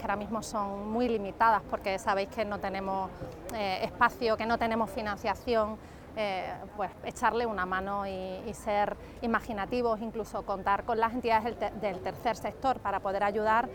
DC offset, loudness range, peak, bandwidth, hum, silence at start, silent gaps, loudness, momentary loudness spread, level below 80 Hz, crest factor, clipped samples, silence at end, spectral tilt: under 0.1%; 2 LU; -10 dBFS; 19.5 kHz; none; 0 s; none; -31 LUFS; 9 LU; -52 dBFS; 20 dB; under 0.1%; 0 s; -5 dB/octave